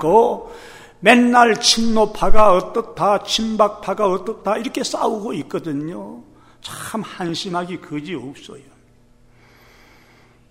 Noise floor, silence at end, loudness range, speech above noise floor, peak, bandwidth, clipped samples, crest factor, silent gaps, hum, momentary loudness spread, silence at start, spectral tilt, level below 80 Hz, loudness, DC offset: -51 dBFS; 1.95 s; 14 LU; 35 dB; 0 dBFS; 15 kHz; under 0.1%; 18 dB; none; none; 18 LU; 0 s; -3.5 dB/octave; -34 dBFS; -18 LUFS; under 0.1%